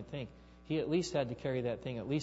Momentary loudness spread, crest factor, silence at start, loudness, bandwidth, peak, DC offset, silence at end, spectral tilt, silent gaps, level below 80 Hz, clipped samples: 11 LU; 16 dB; 0 s; -37 LUFS; 7.6 kHz; -20 dBFS; under 0.1%; 0 s; -6 dB/octave; none; -60 dBFS; under 0.1%